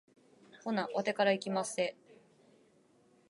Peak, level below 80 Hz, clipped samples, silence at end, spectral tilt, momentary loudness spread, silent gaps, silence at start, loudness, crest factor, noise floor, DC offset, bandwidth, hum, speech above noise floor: -16 dBFS; -88 dBFS; under 0.1%; 1.35 s; -4 dB/octave; 7 LU; none; 0.55 s; -34 LUFS; 20 dB; -67 dBFS; under 0.1%; 11.5 kHz; none; 34 dB